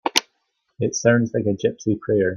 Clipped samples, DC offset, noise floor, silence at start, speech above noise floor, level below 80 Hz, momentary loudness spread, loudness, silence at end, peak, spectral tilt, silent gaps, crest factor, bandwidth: under 0.1%; under 0.1%; -72 dBFS; 0.05 s; 52 dB; -58 dBFS; 7 LU; -21 LUFS; 0 s; 0 dBFS; -4.5 dB/octave; none; 20 dB; 14 kHz